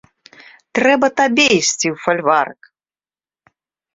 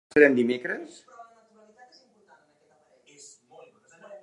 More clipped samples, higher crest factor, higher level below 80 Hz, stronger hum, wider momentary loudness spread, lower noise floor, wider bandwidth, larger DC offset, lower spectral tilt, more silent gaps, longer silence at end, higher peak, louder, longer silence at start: neither; second, 18 dB vs 26 dB; first, -60 dBFS vs -72 dBFS; neither; second, 7 LU vs 30 LU; first, under -90 dBFS vs -64 dBFS; second, 8 kHz vs 10.5 kHz; neither; second, -2.5 dB/octave vs -5.5 dB/octave; neither; first, 1.45 s vs 0.05 s; first, 0 dBFS vs -4 dBFS; first, -15 LUFS vs -23 LUFS; first, 0.75 s vs 0.15 s